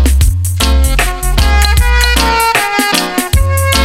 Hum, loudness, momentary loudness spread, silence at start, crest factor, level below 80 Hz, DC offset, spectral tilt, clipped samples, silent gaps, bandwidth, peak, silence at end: none; -11 LUFS; 4 LU; 0 s; 10 dB; -12 dBFS; under 0.1%; -3.5 dB/octave; under 0.1%; none; 16.5 kHz; 0 dBFS; 0 s